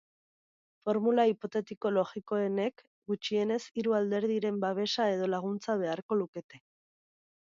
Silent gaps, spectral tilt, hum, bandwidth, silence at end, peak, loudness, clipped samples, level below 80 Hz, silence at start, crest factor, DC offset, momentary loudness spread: 1.77-1.81 s, 2.87-3.02 s, 6.02-6.09 s, 6.28-6.33 s, 6.44-6.49 s; -6 dB/octave; none; 7.6 kHz; 0.85 s; -14 dBFS; -31 LUFS; under 0.1%; -80 dBFS; 0.85 s; 18 dB; under 0.1%; 8 LU